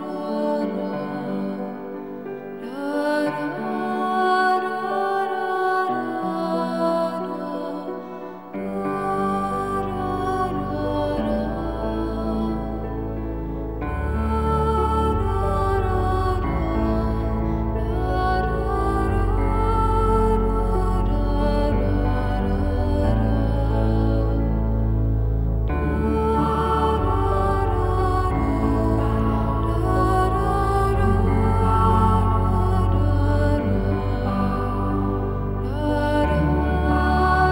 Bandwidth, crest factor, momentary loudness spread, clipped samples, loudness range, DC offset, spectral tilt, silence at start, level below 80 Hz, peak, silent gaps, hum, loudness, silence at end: 16.5 kHz; 16 dB; 8 LU; under 0.1%; 6 LU; 0.3%; -8 dB/octave; 0 s; -26 dBFS; -6 dBFS; none; none; -22 LUFS; 0 s